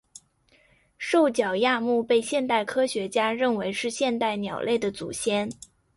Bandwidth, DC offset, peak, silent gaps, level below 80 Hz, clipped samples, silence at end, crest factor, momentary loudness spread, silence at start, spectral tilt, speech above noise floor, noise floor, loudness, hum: 11.5 kHz; under 0.1%; -10 dBFS; none; -64 dBFS; under 0.1%; 0.45 s; 16 dB; 7 LU; 1 s; -4 dB/octave; 38 dB; -63 dBFS; -25 LUFS; none